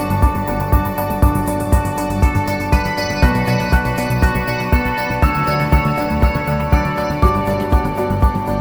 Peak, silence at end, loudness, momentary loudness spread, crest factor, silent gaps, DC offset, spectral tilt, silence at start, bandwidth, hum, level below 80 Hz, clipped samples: 0 dBFS; 0 s; -17 LUFS; 3 LU; 16 dB; none; under 0.1%; -6.5 dB/octave; 0 s; over 20 kHz; none; -20 dBFS; under 0.1%